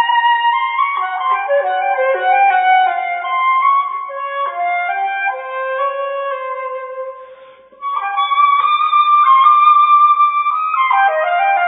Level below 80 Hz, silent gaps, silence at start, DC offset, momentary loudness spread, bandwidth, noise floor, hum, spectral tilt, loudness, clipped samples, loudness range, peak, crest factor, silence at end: -74 dBFS; none; 0 s; under 0.1%; 14 LU; 4 kHz; -41 dBFS; none; -4 dB/octave; -14 LUFS; under 0.1%; 9 LU; -2 dBFS; 14 dB; 0 s